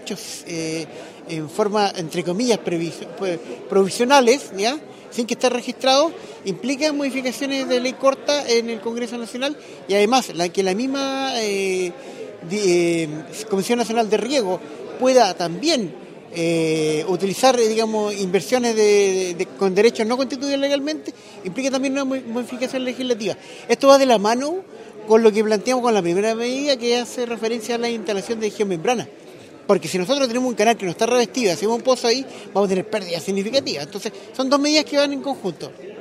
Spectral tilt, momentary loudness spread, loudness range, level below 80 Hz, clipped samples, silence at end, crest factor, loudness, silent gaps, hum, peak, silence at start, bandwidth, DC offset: -4 dB/octave; 13 LU; 4 LU; -70 dBFS; under 0.1%; 0 s; 20 dB; -20 LUFS; none; none; 0 dBFS; 0 s; 15.5 kHz; under 0.1%